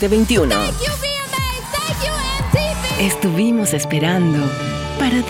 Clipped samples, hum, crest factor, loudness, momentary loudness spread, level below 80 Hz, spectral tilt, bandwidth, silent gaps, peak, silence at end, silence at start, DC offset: under 0.1%; none; 14 dB; -18 LUFS; 6 LU; -30 dBFS; -4.5 dB/octave; 18 kHz; none; -4 dBFS; 0 s; 0 s; under 0.1%